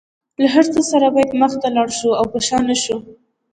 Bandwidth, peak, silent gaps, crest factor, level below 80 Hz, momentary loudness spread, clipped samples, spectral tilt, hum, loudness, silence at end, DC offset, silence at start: 10.5 kHz; 0 dBFS; none; 16 dB; -52 dBFS; 6 LU; under 0.1%; -3.5 dB/octave; none; -16 LUFS; 0.4 s; under 0.1%; 0.4 s